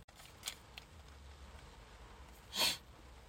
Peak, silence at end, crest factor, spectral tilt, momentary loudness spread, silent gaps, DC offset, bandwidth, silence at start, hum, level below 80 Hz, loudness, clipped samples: -18 dBFS; 0 s; 28 dB; -1 dB/octave; 23 LU; 0.04-0.08 s; under 0.1%; 16.5 kHz; 0 s; none; -60 dBFS; -38 LUFS; under 0.1%